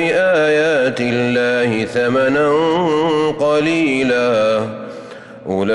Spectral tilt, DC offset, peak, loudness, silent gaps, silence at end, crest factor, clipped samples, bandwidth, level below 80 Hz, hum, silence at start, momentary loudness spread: -5.5 dB/octave; under 0.1%; -6 dBFS; -15 LUFS; none; 0 s; 10 dB; under 0.1%; 11 kHz; -54 dBFS; none; 0 s; 11 LU